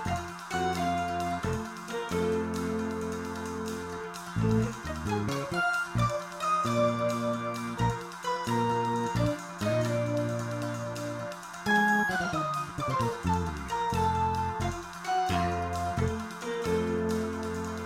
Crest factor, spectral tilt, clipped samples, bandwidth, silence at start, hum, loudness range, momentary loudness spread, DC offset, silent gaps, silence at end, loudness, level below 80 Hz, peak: 16 dB; -5.5 dB/octave; under 0.1%; 16 kHz; 0 s; none; 3 LU; 8 LU; under 0.1%; none; 0 s; -30 LUFS; -48 dBFS; -14 dBFS